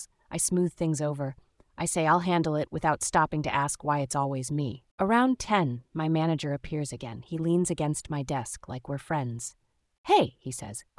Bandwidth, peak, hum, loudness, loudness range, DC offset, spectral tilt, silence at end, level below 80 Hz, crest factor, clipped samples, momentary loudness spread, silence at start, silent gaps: 12 kHz; -10 dBFS; none; -28 LUFS; 4 LU; under 0.1%; -5 dB/octave; 0.15 s; -56 dBFS; 18 dB; under 0.1%; 12 LU; 0 s; 4.91-4.98 s, 9.98-10.04 s